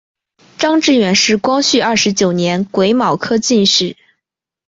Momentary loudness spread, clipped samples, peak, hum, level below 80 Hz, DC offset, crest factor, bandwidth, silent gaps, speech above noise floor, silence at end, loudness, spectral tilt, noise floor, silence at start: 5 LU; under 0.1%; 0 dBFS; none; -54 dBFS; under 0.1%; 14 dB; 7.8 kHz; none; 67 dB; 0.75 s; -13 LUFS; -3.5 dB/octave; -80 dBFS; 0.6 s